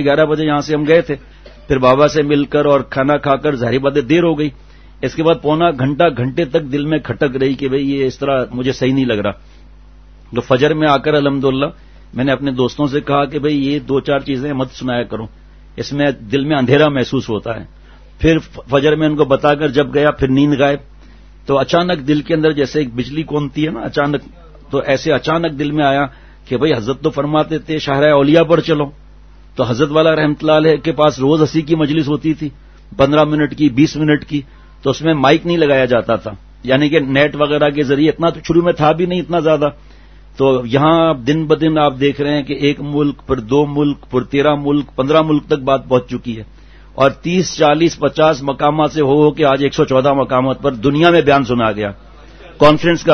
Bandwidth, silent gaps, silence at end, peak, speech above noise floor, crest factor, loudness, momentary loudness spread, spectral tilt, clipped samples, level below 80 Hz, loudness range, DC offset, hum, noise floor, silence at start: 6.6 kHz; none; 0 s; 0 dBFS; 26 dB; 14 dB; -14 LUFS; 8 LU; -6.5 dB/octave; under 0.1%; -40 dBFS; 4 LU; 0.3%; none; -40 dBFS; 0 s